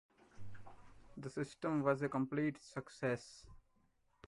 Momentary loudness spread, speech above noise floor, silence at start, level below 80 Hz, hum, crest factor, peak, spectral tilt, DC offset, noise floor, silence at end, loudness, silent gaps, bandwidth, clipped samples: 23 LU; 36 dB; 0.35 s; -68 dBFS; none; 22 dB; -20 dBFS; -7 dB/octave; under 0.1%; -75 dBFS; 0.7 s; -40 LUFS; none; 11.5 kHz; under 0.1%